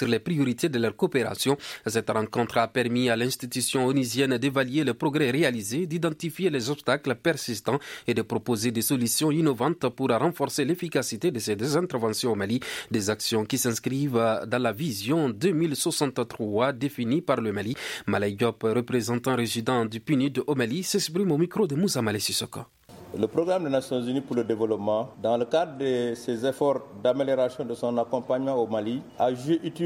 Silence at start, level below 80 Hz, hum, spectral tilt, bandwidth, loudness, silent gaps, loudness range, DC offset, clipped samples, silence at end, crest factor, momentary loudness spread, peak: 0 s; -66 dBFS; none; -5 dB/octave; 16.5 kHz; -26 LUFS; none; 2 LU; under 0.1%; under 0.1%; 0 s; 18 dB; 4 LU; -8 dBFS